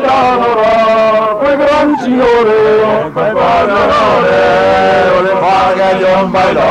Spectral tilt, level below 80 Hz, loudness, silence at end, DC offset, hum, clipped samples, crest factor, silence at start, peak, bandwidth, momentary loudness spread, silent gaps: -5.5 dB/octave; -38 dBFS; -9 LUFS; 0 s; under 0.1%; none; under 0.1%; 8 dB; 0 s; -2 dBFS; 10.5 kHz; 2 LU; none